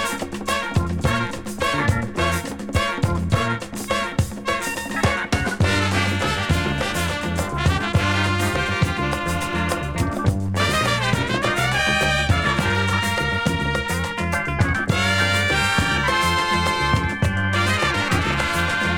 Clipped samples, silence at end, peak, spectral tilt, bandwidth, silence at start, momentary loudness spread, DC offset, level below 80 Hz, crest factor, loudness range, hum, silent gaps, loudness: under 0.1%; 0 s; -4 dBFS; -4.5 dB/octave; 18 kHz; 0 s; 6 LU; under 0.1%; -34 dBFS; 16 dB; 3 LU; none; none; -21 LUFS